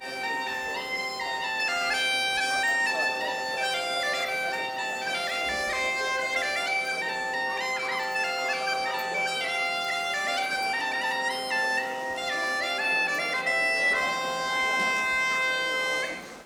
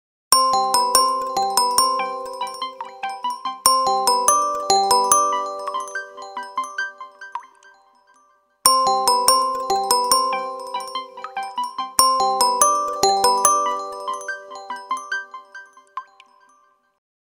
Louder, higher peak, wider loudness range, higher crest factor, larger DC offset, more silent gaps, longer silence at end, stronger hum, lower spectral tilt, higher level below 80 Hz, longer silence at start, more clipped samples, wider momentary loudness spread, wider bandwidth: second, -26 LUFS vs -19 LUFS; second, -14 dBFS vs 0 dBFS; second, 3 LU vs 6 LU; second, 14 dB vs 22 dB; neither; neither; second, 0 s vs 1.25 s; neither; about the same, -0.5 dB/octave vs 0.5 dB/octave; about the same, -64 dBFS vs -60 dBFS; second, 0 s vs 0.3 s; neither; second, 6 LU vs 17 LU; first, over 20 kHz vs 16.5 kHz